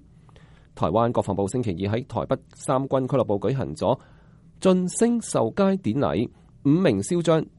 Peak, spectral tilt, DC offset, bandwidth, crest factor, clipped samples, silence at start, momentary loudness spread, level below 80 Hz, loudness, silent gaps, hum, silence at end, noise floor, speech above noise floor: -6 dBFS; -6.5 dB/octave; under 0.1%; 11.5 kHz; 18 dB; under 0.1%; 0.75 s; 7 LU; -52 dBFS; -24 LUFS; none; none; 0.1 s; -50 dBFS; 28 dB